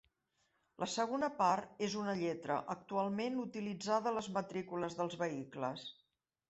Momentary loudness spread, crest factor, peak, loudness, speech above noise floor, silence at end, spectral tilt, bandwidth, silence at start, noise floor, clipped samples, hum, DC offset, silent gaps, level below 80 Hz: 8 LU; 20 dB; -20 dBFS; -38 LUFS; 43 dB; 0.55 s; -5 dB/octave; 8.2 kHz; 0.8 s; -81 dBFS; under 0.1%; none; under 0.1%; none; -78 dBFS